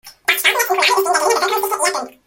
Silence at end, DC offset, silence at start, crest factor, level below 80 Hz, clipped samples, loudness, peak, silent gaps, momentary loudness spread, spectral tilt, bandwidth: 0.15 s; under 0.1%; 0.05 s; 18 dB; -64 dBFS; under 0.1%; -15 LUFS; 0 dBFS; none; 4 LU; 1 dB/octave; 17 kHz